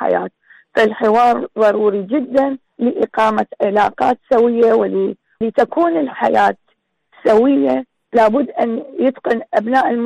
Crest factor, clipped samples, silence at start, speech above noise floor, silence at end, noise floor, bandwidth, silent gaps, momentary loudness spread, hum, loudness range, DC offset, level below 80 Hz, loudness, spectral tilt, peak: 12 dB; under 0.1%; 0 s; 49 dB; 0 s; -64 dBFS; 10 kHz; none; 7 LU; none; 1 LU; under 0.1%; -56 dBFS; -16 LUFS; -6.5 dB/octave; -4 dBFS